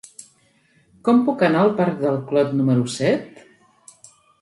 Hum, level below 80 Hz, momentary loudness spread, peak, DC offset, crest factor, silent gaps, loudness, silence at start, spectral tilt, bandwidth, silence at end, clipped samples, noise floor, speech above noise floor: none; -66 dBFS; 7 LU; -4 dBFS; under 0.1%; 16 dB; none; -19 LUFS; 1.05 s; -6.5 dB/octave; 11.5 kHz; 1.15 s; under 0.1%; -59 dBFS; 41 dB